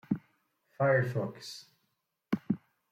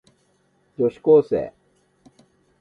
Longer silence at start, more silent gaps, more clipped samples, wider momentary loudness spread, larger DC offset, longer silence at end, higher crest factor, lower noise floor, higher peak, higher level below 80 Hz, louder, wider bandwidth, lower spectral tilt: second, 0.1 s vs 0.8 s; neither; neither; about the same, 17 LU vs 19 LU; neither; second, 0.35 s vs 1.1 s; about the same, 20 dB vs 18 dB; first, -80 dBFS vs -64 dBFS; second, -14 dBFS vs -6 dBFS; second, -76 dBFS vs -60 dBFS; second, -32 LUFS vs -19 LUFS; first, 15 kHz vs 5 kHz; second, -7 dB/octave vs -9.5 dB/octave